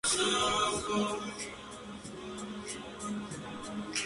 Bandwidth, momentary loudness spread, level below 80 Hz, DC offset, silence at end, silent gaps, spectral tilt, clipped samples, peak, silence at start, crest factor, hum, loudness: 11.5 kHz; 16 LU; -60 dBFS; under 0.1%; 0 s; none; -2.5 dB/octave; under 0.1%; -16 dBFS; 0.05 s; 18 dB; none; -34 LUFS